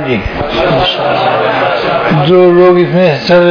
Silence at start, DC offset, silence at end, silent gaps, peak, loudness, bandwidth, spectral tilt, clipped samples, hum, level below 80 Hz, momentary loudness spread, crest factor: 0 s; under 0.1%; 0 s; none; 0 dBFS; -9 LUFS; 5.4 kHz; -7.5 dB/octave; 0.9%; none; -32 dBFS; 7 LU; 8 dB